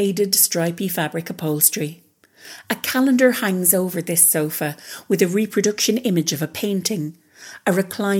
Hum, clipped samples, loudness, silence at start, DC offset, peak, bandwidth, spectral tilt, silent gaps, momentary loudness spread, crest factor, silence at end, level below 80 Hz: none; under 0.1%; -19 LUFS; 0 s; under 0.1%; 0 dBFS; 18 kHz; -3.5 dB/octave; none; 12 LU; 20 dB; 0 s; -70 dBFS